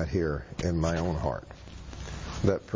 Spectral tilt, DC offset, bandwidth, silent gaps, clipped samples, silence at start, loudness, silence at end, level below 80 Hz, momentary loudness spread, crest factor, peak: -6.5 dB/octave; under 0.1%; 7.6 kHz; none; under 0.1%; 0 s; -31 LUFS; 0 s; -40 dBFS; 15 LU; 18 dB; -12 dBFS